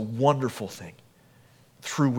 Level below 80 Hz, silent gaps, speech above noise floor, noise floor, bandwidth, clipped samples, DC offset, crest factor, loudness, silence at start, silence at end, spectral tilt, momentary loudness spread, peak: -70 dBFS; none; 31 dB; -57 dBFS; 17.5 kHz; under 0.1%; under 0.1%; 22 dB; -27 LUFS; 0 s; 0 s; -6 dB/octave; 19 LU; -6 dBFS